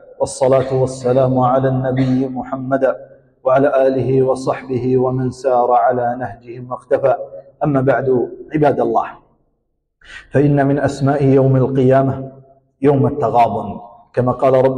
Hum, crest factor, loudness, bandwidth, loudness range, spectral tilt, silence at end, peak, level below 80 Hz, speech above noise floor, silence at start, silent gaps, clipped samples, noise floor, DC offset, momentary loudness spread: none; 12 dB; -16 LUFS; 9.8 kHz; 3 LU; -8 dB/octave; 0 s; -4 dBFS; -46 dBFS; 53 dB; 0.2 s; none; under 0.1%; -68 dBFS; under 0.1%; 11 LU